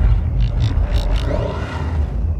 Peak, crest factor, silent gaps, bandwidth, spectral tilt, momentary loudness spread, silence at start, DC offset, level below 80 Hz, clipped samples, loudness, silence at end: -4 dBFS; 12 dB; none; 8.2 kHz; -7.5 dB/octave; 4 LU; 0 s; under 0.1%; -18 dBFS; under 0.1%; -20 LUFS; 0 s